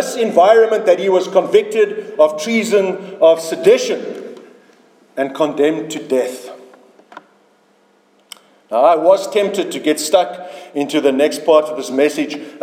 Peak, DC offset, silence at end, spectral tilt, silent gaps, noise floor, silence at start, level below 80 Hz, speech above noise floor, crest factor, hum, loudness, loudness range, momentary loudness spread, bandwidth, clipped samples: 0 dBFS; under 0.1%; 0 s; -4 dB/octave; none; -55 dBFS; 0 s; -70 dBFS; 40 dB; 16 dB; none; -15 LUFS; 8 LU; 12 LU; 16 kHz; under 0.1%